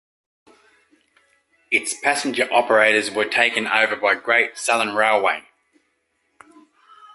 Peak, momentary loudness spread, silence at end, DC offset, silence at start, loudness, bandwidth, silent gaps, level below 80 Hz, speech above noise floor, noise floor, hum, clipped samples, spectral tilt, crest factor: -2 dBFS; 6 LU; 1.75 s; under 0.1%; 1.7 s; -18 LUFS; 11.5 kHz; none; -72 dBFS; 50 dB; -69 dBFS; none; under 0.1%; -1.5 dB/octave; 20 dB